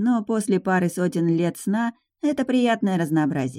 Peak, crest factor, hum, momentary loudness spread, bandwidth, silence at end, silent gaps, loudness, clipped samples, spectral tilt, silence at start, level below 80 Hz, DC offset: -8 dBFS; 14 dB; none; 5 LU; 15.5 kHz; 0 s; none; -23 LUFS; under 0.1%; -6.5 dB/octave; 0 s; -66 dBFS; under 0.1%